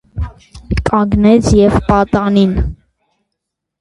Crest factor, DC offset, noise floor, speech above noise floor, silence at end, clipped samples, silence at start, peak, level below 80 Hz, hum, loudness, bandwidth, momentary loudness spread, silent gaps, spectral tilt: 14 dB; under 0.1%; -76 dBFS; 65 dB; 1.05 s; under 0.1%; 0.15 s; 0 dBFS; -24 dBFS; none; -12 LUFS; 11.5 kHz; 15 LU; none; -7 dB/octave